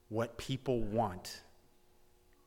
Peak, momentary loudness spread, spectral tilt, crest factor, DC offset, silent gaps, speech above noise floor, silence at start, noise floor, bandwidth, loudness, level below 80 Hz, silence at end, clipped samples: -22 dBFS; 13 LU; -6 dB/octave; 18 dB; under 0.1%; none; 29 dB; 0.1 s; -65 dBFS; 18 kHz; -37 LUFS; -52 dBFS; 1.05 s; under 0.1%